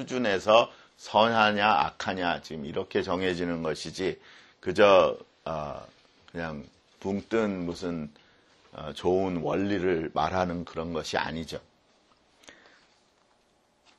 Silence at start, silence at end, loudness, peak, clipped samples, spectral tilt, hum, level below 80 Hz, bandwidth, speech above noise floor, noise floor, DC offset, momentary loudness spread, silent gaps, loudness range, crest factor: 0 s; 1.45 s; -27 LUFS; -4 dBFS; under 0.1%; -5 dB/octave; none; -58 dBFS; 12 kHz; 40 dB; -67 dBFS; under 0.1%; 17 LU; none; 8 LU; 24 dB